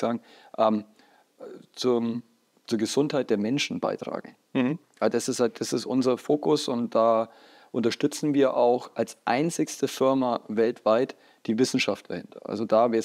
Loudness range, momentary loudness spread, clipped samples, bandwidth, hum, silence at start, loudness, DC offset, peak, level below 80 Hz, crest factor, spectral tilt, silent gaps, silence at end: 3 LU; 12 LU; under 0.1%; 15.5 kHz; none; 0 s; -26 LUFS; under 0.1%; -8 dBFS; -82 dBFS; 18 dB; -5 dB/octave; none; 0 s